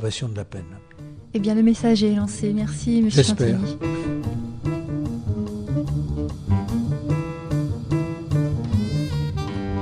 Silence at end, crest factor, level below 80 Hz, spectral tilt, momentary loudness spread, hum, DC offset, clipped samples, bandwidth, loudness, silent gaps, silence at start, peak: 0 s; 20 dB; -38 dBFS; -6.5 dB/octave; 11 LU; none; under 0.1%; under 0.1%; 10.5 kHz; -23 LUFS; none; 0 s; -2 dBFS